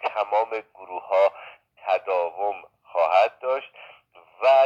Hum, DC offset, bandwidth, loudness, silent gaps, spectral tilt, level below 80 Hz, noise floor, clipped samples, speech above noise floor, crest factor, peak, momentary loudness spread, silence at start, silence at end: none; under 0.1%; 7.2 kHz; -24 LUFS; none; -2.5 dB/octave; -80 dBFS; -53 dBFS; under 0.1%; 29 dB; 16 dB; -6 dBFS; 17 LU; 0 s; 0 s